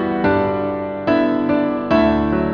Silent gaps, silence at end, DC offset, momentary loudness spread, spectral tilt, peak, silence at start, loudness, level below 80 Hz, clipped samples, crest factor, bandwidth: none; 0 s; under 0.1%; 6 LU; -8.5 dB/octave; -4 dBFS; 0 s; -18 LUFS; -38 dBFS; under 0.1%; 14 dB; 6.6 kHz